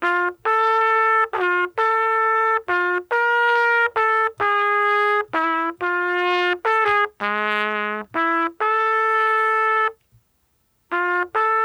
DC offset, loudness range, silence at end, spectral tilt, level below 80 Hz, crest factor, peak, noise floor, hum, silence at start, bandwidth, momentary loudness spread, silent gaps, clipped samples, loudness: under 0.1%; 2 LU; 0 s; -4 dB/octave; -66 dBFS; 14 dB; -6 dBFS; -66 dBFS; none; 0 s; 19.5 kHz; 5 LU; none; under 0.1%; -19 LUFS